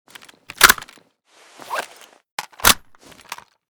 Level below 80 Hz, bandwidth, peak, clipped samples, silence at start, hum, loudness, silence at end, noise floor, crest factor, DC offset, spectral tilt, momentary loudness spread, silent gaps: -46 dBFS; over 20 kHz; 0 dBFS; 0.2%; 0.6 s; none; -16 LUFS; 0.35 s; -54 dBFS; 22 dB; under 0.1%; 0 dB/octave; 24 LU; 2.32-2.38 s